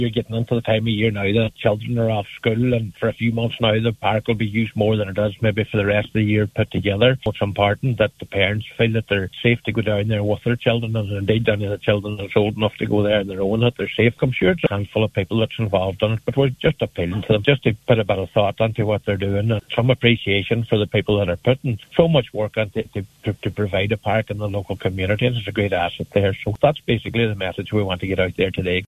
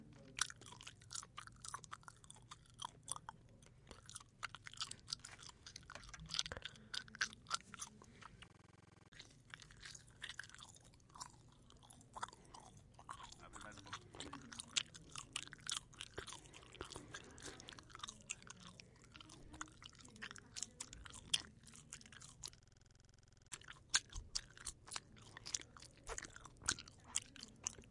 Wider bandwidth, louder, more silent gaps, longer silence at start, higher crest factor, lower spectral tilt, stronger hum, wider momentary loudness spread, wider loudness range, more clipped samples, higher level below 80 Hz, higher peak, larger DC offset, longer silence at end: about the same, 13 kHz vs 12 kHz; first, -20 LUFS vs -48 LUFS; second, none vs 9.08-9.12 s; about the same, 0 s vs 0 s; second, 20 dB vs 36 dB; first, -7.5 dB/octave vs -0.5 dB/octave; neither; second, 5 LU vs 18 LU; second, 2 LU vs 9 LU; neither; first, -44 dBFS vs -68 dBFS; first, 0 dBFS vs -16 dBFS; neither; about the same, 0 s vs 0 s